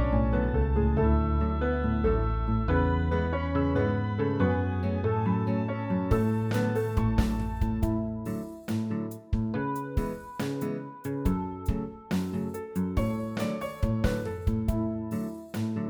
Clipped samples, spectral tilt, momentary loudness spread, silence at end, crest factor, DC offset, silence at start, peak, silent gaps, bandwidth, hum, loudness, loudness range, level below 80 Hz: under 0.1%; -8 dB/octave; 8 LU; 0 s; 18 dB; under 0.1%; 0 s; -10 dBFS; none; over 20 kHz; none; -29 LUFS; 5 LU; -34 dBFS